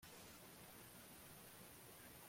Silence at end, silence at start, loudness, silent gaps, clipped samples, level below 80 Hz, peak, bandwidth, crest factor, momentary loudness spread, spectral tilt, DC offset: 0 s; 0 s; -59 LUFS; none; under 0.1%; -78 dBFS; -48 dBFS; 16.5 kHz; 14 dB; 0 LU; -3 dB/octave; under 0.1%